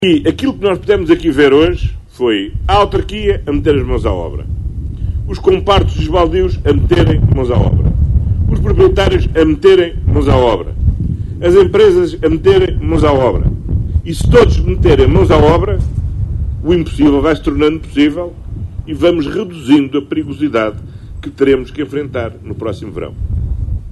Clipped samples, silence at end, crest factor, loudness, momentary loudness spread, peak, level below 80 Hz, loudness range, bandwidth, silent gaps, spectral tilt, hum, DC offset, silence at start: under 0.1%; 0 s; 12 dB; -13 LUFS; 13 LU; 0 dBFS; -20 dBFS; 5 LU; 12 kHz; none; -7.5 dB/octave; none; under 0.1%; 0 s